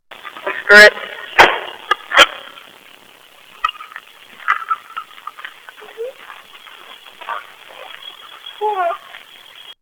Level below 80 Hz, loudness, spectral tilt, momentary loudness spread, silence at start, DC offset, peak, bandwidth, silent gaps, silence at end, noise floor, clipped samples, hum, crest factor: -52 dBFS; -12 LUFS; -1 dB/octave; 28 LU; 0.25 s; under 0.1%; 0 dBFS; over 20 kHz; none; 0.1 s; -45 dBFS; 0.3%; none; 18 dB